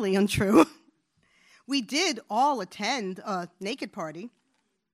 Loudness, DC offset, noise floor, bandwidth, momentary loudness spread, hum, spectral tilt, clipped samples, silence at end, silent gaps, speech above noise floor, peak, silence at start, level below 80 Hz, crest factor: -27 LUFS; under 0.1%; -75 dBFS; 15.5 kHz; 15 LU; none; -4.5 dB/octave; under 0.1%; 0.65 s; none; 48 dB; -6 dBFS; 0 s; -58 dBFS; 22 dB